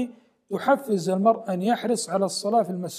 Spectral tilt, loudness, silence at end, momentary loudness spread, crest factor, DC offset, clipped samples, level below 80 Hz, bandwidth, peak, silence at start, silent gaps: -5 dB/octave; -24 LUFS; 0 s; 5 LU; 16 dB; under 0.1%; under 0.1%; -78 dBFS; 15.5 kHz; -8 dBFS; 0 s; none